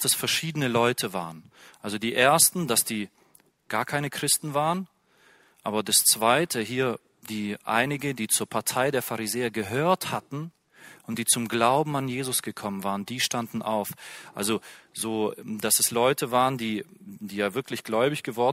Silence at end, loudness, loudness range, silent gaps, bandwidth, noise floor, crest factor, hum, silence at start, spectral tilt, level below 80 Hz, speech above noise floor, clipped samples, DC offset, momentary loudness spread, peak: 0 s; -25 LUFS; 4 LU; none; 16 kHz; -61 dBFS; 22 dB; none; 0 s; -3 dB/octave; -68 dBFS; 35 dB; under 0.1%; under 0.1%; 15 LU; -4 dBFS